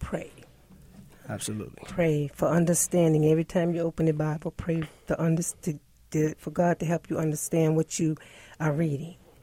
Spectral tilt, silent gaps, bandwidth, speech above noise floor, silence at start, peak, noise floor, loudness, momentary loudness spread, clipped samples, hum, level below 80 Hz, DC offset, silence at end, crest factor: -6 dB/octave; none; 16 kHz; 27 dB; 0 s; -12 dBFS; -53 dBFS; -27 LUFS; 12 LU; under 0.1%; none; -52 dBFS; under 0.1%; 0.3 s; 16 dB